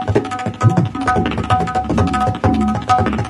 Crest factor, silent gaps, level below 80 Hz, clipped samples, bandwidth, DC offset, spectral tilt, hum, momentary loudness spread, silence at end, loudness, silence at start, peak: 16 dB; none; -32 dBFS; under 0.1%; 11.5 kHz; under 0.1%; -7 dB/octave; none; 3 LU; 0 s; -17 LUFS; 0 s; 0 dBFS